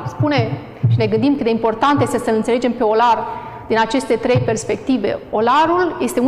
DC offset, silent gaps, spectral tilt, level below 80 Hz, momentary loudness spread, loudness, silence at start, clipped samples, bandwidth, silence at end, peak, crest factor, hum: 0.2%; none; -6 dB/octave; -48 dBFS; 6 LU; -17 LUFS; 0 s; under 0.1%; 13.5 kHz; 0 s; -4 dBFS; 12 dB; none